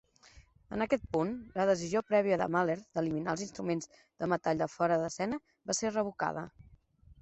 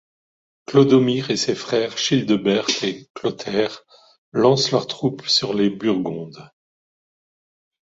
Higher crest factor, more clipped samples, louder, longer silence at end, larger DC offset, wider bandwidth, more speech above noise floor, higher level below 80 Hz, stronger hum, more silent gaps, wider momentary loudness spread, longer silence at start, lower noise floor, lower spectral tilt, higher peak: about the same, 18 dB vs 20 dB; neither; second, -33 LUFS vs -20 LUFS; second, 0.1 s vs 1.45 s; neither; about the same, 8.4 kHz vs 8 kHz; second, 28 dB vs over 70 dB; about the same, -62 dBFS vs -62 dBFS; neither; second, none vs 3.10-3.14 s, 4.18-4.32 s; second, 8 LU vs 11 LU; second, 0.35 s vs 0.7 s; second, -60 dBFS vs under -90 dBFS; about the same, -5 dB/octave vs -5 dB/octave; second, -14 dBFS vs -2 dBFS